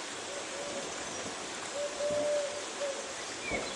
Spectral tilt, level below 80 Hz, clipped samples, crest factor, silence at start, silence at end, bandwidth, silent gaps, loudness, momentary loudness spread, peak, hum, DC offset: -1.5 dB/octave; -64 dBFS; under 0.1%; 14 dB; 0 s; 0 s; 11.5 kHz; none; -36 LUFS; 6 LU; -22 dBFS; none; under 0.1%